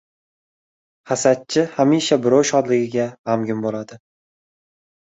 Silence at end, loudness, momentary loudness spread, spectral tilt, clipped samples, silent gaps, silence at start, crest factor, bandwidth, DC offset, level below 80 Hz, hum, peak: 1.15 s; -19 LUFS; 10 LU; -4.5 dB/octave; under 0.1%; 3.19-3.24 s; 1.05 s; 20 dB; 8.2 kHz; under 0.1%; -64 dBFS; none; -2 dBFS